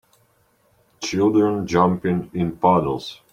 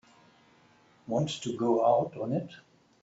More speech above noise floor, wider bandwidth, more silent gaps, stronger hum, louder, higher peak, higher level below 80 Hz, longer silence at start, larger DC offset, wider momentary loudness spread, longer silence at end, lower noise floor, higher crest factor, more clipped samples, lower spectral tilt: first, 42 dB vs 33 dB; first, 10 kHz vs 8 kHz; neither; neither; first, -20 LUFS vs -29 LUFS; first, -2 dBFS vs -14 dBFS; first, -52 dBFS vs -70 dBFS; about the same, 1 s vs 1.1 s; neither; second, 9 LU vs 13 LU; second, 0.15 s vs 0.4 s; about the same, -62 dBFS vs -62 dBFS; about the same, 20 dB vs 18 dB; neither; about the same, -6.5 dB/octave vs -6.5 dB/octave